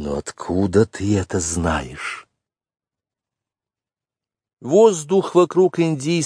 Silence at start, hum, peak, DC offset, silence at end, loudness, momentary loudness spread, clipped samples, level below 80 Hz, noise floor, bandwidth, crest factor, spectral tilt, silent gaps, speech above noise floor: 0 s; none; -2 dBFS; under 0.1%; 0 s; -19 LUFS; 14 LU; under 0.1%; -44 dBFS; under -90 dBFS; 10.5 kHz; 18 dB; -5.5 dB/octave; 4.53-4.57 s; over 72 dB